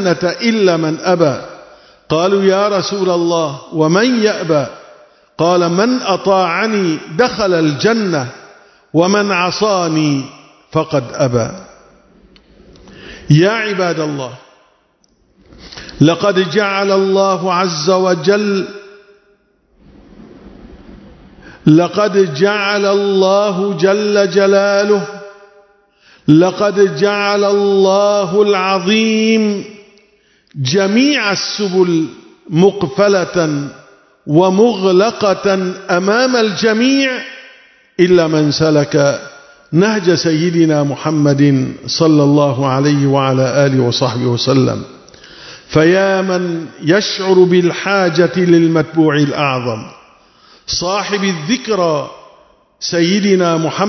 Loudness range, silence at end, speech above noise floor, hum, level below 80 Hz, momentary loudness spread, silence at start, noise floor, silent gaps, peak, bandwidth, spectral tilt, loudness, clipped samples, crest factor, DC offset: 5 LU; 0 s; 44 dB; none; -50 dBFS; 9 LU; 0 s; -56 dBFS; none; 0 dBFS; 6.4 kHz; -5.5 dB/octave; -13 LUFS; under 0.1%; 14 dB; under 0.1%